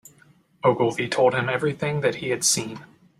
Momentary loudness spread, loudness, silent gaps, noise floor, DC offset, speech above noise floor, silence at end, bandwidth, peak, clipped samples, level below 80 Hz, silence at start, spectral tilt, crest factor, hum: 4 LU; -22 LUFS; none; -57 dBFS; under 0.1%; 34 dB; 0.35 s; 15.5 kHz; -6 dBFS; under 0.1%; -62 dBFS; 0.65 s; -3.5 dB/octave; 18 dB; none